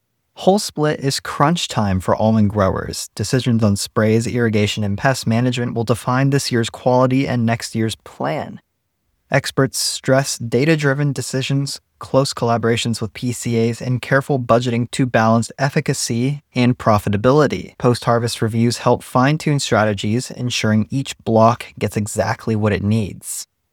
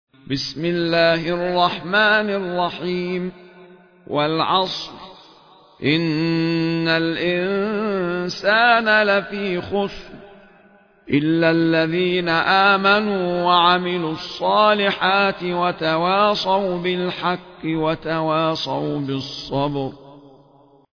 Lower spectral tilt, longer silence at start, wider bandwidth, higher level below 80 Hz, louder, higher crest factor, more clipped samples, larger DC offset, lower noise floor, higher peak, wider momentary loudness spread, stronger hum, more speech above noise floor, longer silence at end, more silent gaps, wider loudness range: about the same, -5.5 dB/octave vs -6 dB/octave; about the same, 0.35 s vs 0.25 s; first, 17.5 kHz vs 5.4 kHz; first, -48 dBFS vs -54 dBFS; about the same, -18 LUFS vs -19 LUFS; about the same, 18 dB vs 16 dB; neither; neither; first, -70 dBFS vs -52 dBFS; first, 0 dBFS vs -4 dBFS; second, 7 LU vs 11 LU; neither; first, 52 dB vs 33 dB; second, 0.3 s vs 0.75 s; neither; second, 2 LU vs 6 LU